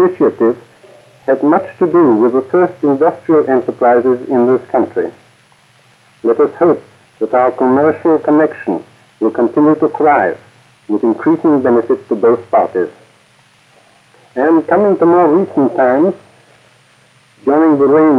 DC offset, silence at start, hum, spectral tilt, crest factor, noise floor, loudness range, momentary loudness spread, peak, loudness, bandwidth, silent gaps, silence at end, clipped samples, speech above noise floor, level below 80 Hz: under 0.1%; 0 s; none; -9 dB/octave; 12 dB; -49 dBFS; 3 LU; 10 LU; 0 dBFS; -12 LUFS; 5.4 kHz; none; 0 s; under 0.1%; 38 dB; -66 dBFS